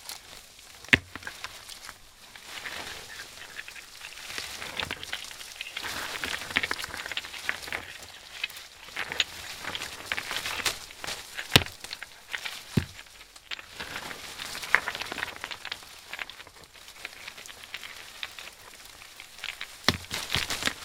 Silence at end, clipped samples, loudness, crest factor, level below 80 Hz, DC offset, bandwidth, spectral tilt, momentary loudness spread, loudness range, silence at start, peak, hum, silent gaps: 0 s; under 0.1%; -32 LUFS; 34 dB; -56 dBFS; under 0.1%; 18 kHz; -2 dB/octave; 18 LU; 10 LU; 0 s; 0 dBFS; none; none